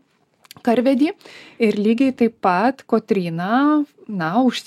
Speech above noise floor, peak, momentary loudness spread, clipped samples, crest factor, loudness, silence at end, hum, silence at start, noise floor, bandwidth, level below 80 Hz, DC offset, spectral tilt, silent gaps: 39 dB; -2 dBFS; 6 LU; under 0.1%; 16 dB; -19 LUFS; 0.05 s; none; 0.65 s; -58 dBFS; 13 kHz; -66 dBFS; under 0.1%; -6.5 dB/octave; none